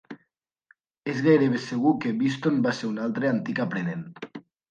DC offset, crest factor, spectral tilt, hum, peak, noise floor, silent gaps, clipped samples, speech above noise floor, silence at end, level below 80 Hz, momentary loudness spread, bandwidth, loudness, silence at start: under 0.1%; 18 dB; -7 dB/octave; none; -8 dBFS; -74 dBFS; none; under 0.1%; 49 dB; 0.3 s; -72 dBFS; 19 LU; 8.8 kHz; -25 LUFS; 0.1 s